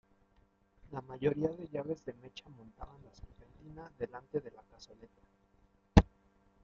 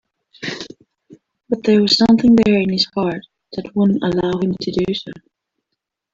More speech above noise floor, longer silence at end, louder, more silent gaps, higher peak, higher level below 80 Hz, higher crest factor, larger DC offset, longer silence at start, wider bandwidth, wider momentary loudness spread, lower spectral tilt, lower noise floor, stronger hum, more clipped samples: second, 29 dB vs 63 dB; second, 0.6 s vs 0.95 s; second, -35 LUFS vs -16 LUFS; neither; second, -6 dBFS vs -2 dBFS; first, -44 dBFS vs -50 dBFS; first, 30 dB vs 16 dB; neither; first, 0.9 s vs 0.4 s; about the same, 7.6 kHz vs 7.6 kHz; first, 28 LU vs 19 LU; about the same, -7 dB/octave vs -6 dB/octave; second, -70 dBFS vs -79 dBFS; neither; neither